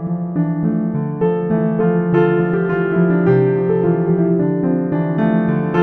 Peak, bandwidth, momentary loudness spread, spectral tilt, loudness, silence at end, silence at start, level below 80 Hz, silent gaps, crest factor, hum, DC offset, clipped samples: -2 dBFS; 3.9 kHz; 4 LU; -11.5 dB/octave; -16 LUFS; 0 s; 0 s; -50 dBFS; none; 14 dB; none; under 0.1%; under 0.1%